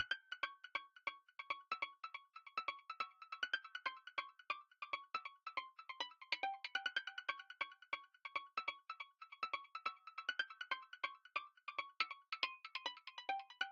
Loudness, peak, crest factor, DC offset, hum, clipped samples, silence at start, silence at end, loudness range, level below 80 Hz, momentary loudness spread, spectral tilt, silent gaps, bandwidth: -46 LUFS; -22 dBFS; 26 dB; under 0.1%; none; under 0.1%; 0 s; 0 s; 2 LU; under -90 dBFS; 5 LU; 4.5 dB/octave; none; 8 kHz